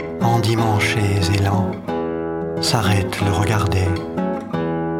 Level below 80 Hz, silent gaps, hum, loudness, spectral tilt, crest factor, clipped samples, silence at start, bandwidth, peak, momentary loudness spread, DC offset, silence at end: -42 dBFS; none; none; -19 LUFS; -5.5 dB/octave; 18 dB; under 0.1%; 0 s; 16.5 kHz; -2 dBFS; 7 LU; under 0.1%; 0 s